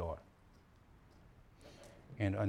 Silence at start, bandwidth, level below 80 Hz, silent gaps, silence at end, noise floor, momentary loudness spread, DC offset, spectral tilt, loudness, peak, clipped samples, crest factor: 0 s; 11 kHz; -60 dBFS; none; 0 s; -64 dBFS; 25 LU; under 0.1%; -8 dB/octave; -45 LUFS; -22 dBFS; under 0.1%; 22 dB